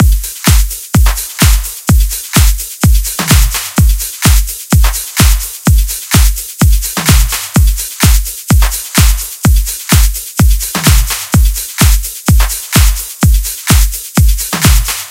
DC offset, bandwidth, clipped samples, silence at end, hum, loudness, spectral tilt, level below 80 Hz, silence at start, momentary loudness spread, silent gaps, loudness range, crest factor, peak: under 0.1%; 17.5 kHz; 0.6%; 0 s; none; -11 LUFS; -4 dB/octave; -12 dBFS; 0 s; 3 LU; none; 1 LU; 10 dB; 0 dBFS